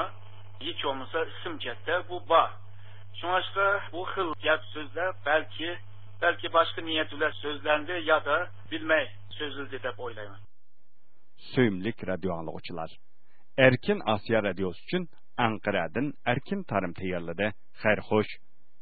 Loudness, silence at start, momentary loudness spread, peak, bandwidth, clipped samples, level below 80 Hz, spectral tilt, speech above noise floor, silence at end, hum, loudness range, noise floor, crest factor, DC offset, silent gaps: -29 LUFS; 0 s; 13 LU; -4 dBFS; 4.8 kHz; under 0.1%; -58 dBFS; -9.5 dB/octave; 47 dB; 0.45 s; none; 6 LU; -76 dBFS; 26 dB; 1%; none